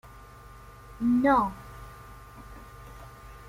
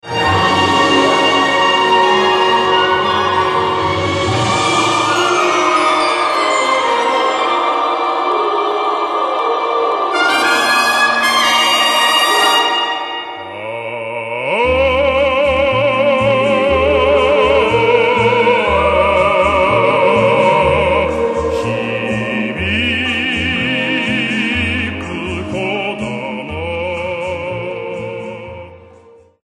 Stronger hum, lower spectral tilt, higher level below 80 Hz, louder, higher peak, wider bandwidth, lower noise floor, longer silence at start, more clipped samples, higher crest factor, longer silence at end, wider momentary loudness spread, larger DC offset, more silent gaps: neither; first, -7 dB/octave vs -4 dB/octave; second, -50 dBFS vs -36 dBFS; second, -25 LUFS vs -13 LUFS; second, -12 dBFS vs 0 dBFS; first, 16 kHz vs 13 kHz; first, -48 dBFS vs -44 dBFS; first, 0.9 s vs 0.05 s; neither; first, 20 dB vs 14 dB; second, 0 s vs 0.65 s; first, 26 LU vs 11 LU; neither; neither